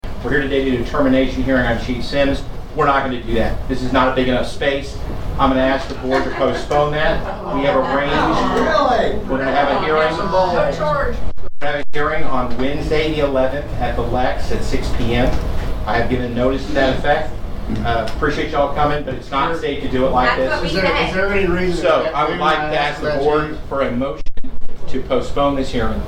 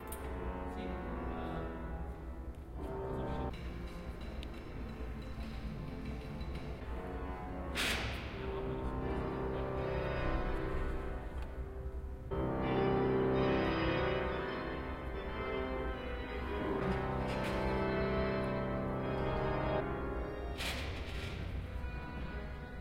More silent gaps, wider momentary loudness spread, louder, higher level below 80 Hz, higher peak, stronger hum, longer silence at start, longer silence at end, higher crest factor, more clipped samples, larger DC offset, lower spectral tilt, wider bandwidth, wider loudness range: neither; second, 8 LU vs 11 LU; first, -18 LUFS vs -39 LUFS; first, -26 dBFS vs -44 dBFS; first, -2 dBFS vs -20 dBFS; neither; about the same, 0.05 s vs 0 s; about the same, 0 s vs 0 s; about the same, 14 dB vs 16 dB; neither; neither; about the same, -6 dB/octave vs -6.5 dB/octave; second, 10 kHz vs 16 kHz; second, 3 LU vs 9 LU